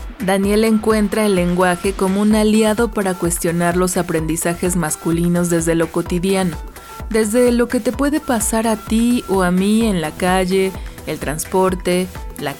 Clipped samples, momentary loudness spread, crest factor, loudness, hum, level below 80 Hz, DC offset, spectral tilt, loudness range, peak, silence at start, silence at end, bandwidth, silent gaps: under 0.1%; 7 LU; 14 dB; -17 LUFS; none; -34 dBFS; 0.1%; -5 dB/octave; 2 LU; -2 dBFS; 0 s; 0 s; 18.5 kHz; none